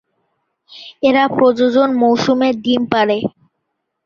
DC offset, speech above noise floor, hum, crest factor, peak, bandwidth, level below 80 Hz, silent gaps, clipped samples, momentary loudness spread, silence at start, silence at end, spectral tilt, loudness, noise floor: under 0.1%; 60 dB; none; 14 dB; -2 dBFS; 7 kHz; -56 dBFS; none; under 0.1%; 10 LU; 0.7 s; 0.75 s; -5.5 dB/octave; -14 LUFS; -73 dBFS